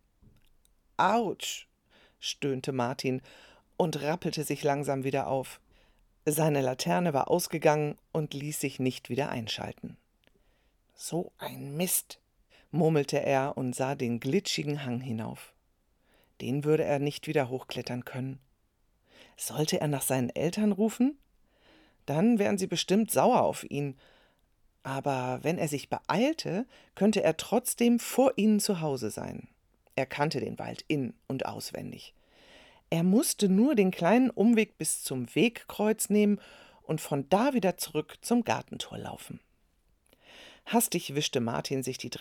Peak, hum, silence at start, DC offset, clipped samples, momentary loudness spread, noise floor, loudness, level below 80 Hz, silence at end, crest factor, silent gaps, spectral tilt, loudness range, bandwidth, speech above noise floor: -10 dBFS; none; 1 s; under 0.1%; under 0.1%; 13 LU; -71 dBFS; -29 LUFS; -66 dBFS; 0 s; 20 dB; none; -5 dB/octave; 7 LU; 19 kHz; 42 dB